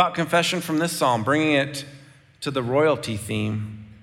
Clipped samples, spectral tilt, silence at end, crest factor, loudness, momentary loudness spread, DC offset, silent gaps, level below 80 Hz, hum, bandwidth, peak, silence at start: under 0.1%; -4.5 dB/octave; 0.05 s; 18 dB; -23 LUFS; 12 LU; under 0.1%; none; -60 dBFS; none; 17 kHz; -4 dBFS; 0 s